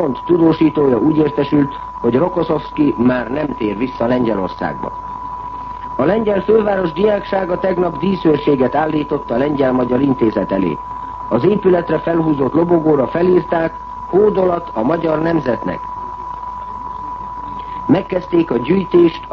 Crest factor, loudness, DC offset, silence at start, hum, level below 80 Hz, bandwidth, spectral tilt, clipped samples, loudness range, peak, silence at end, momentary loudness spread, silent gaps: 14 dB; -16 LUFS; under 0.1%; 0 s; none; -40 dBFS; 6 kHz; -9.5 dB/octave; under 0.1%; 5 LU; -2 dBFS; 0 s; 13 LU; none